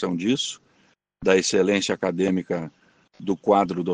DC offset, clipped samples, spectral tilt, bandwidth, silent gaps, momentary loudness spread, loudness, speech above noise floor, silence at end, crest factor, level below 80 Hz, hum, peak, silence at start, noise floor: under 0.1%; under 0.1%; -4.5 dB/octave; 9.8 kHz; none; 10 LU; -23 LUFS; 41 dB; 0 s; 18 dB; -62 dBFS; none; -6 dBFS; 0 s; -63 dBFS